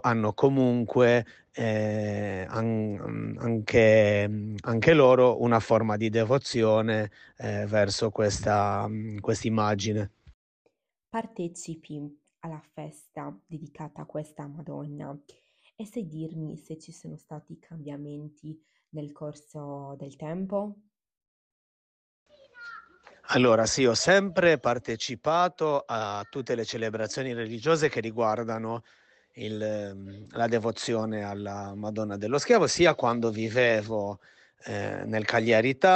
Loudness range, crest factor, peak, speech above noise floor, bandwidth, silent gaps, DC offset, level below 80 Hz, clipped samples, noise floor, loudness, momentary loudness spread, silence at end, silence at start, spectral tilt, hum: 17 LU; 20 dB; -6 dBFS; 27 dB; 9.6 kHz; 10.34-10.65 s, 21.28-22.26 s; under 0.1%; -60 dBFS; under 0.1%; -53 dBFS; -26 LUFS; 20 LU; 0 s; 0.05 s; -5.5 dB/octave; none